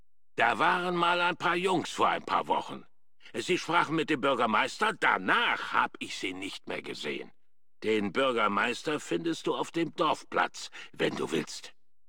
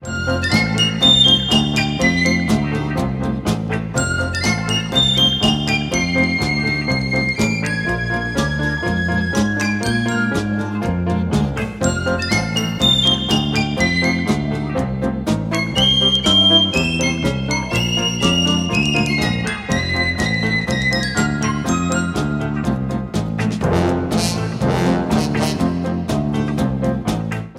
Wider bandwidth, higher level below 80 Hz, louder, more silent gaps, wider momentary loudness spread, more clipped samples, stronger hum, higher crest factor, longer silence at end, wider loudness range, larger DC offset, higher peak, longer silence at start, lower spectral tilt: about the same, 17 kHz vs 15.5 kHz; second, -72 dBFS vs -34 dBFS; second, -29 LUFS vs -17 LUFS; neither; first, 12 LU vs 8 LU; neither; neither; about the same, 20 dB vs 18 dB; first, 0.4 s vs 0 s; about the same, 4 LU vs 5 LU; first, 0.3% vs under 0.1%; second, -10 dBFS vs 0 dBFS; first, 0.35 s vs 0 s; about the same, -4 dB/octave vs -4.5 dB/octave